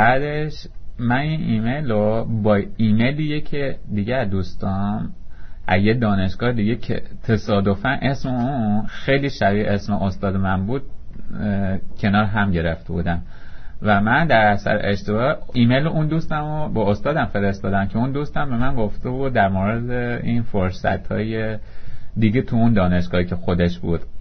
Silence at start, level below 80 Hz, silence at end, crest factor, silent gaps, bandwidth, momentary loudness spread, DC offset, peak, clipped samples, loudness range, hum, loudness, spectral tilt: 0 s; -34 dBFS; 0 s; 18 dB; none; 6.4 kHz; 8 LU; under 0.1%; -2 dBFS; under 0.1%; 3 LU; none; -21 LUFS; -8 dB/octave